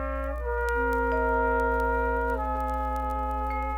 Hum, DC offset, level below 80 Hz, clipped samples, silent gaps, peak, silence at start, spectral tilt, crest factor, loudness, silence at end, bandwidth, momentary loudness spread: 60 Hz at -35 dBFS; under 0.1%; -34 dBFS; under 0.1%; none; -14 dBFS; 0 s; -7.5 dB/octave; 14 dB; -27 LUFS; 0 s; 16 kHz; 5 LU